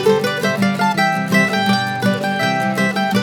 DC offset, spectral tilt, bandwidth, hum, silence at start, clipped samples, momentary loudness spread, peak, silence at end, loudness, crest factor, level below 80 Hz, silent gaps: under 0.1%; -5 dB/octave; 18.5 kHz; none; 0 s; under 0.1%; 3 LU; -2 dBFS; 0 s; -17 LUFS; 14 dB; -66 dBFS; none